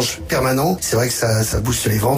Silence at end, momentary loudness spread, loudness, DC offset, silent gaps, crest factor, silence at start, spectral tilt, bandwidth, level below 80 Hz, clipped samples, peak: 0 s; 2 LU; -18 LUFS; under 0.1%; none; 12 dB; 0 s; -4.5 dB/octave; 16 kHz; -34 dBFS; under 0.1%; -6 dBFS